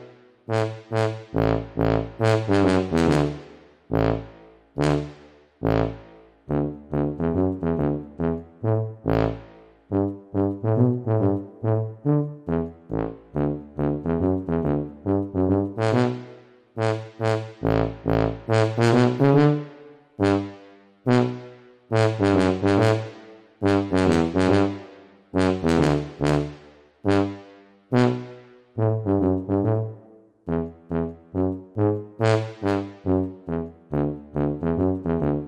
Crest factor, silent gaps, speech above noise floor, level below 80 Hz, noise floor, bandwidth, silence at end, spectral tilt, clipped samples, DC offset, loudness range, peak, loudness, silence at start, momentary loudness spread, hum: 20 dB; none; 27 dB; -44 dBFS; -51 dBFS; 10.5 kHz; 0 s; -7.5 dB/octave; under 0.1%; under 0.1%; 4 LU; -4 dBFS; -24 LUFS; 0 s; 10 LU; none